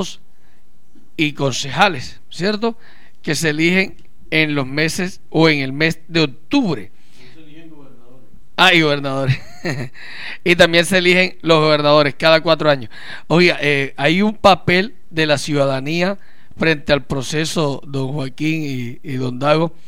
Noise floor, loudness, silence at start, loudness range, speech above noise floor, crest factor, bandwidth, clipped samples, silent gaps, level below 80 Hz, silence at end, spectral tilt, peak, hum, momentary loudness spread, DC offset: -56 dBFS; -16 LUFS; 0 s; 6 LU; 40 dB; 18 dB; 16.5 kHz; under 0.1%; none; -48 dBFS; 0.2 s; -5 dB/octave; 0 dBFS; none; 13 LU; 4%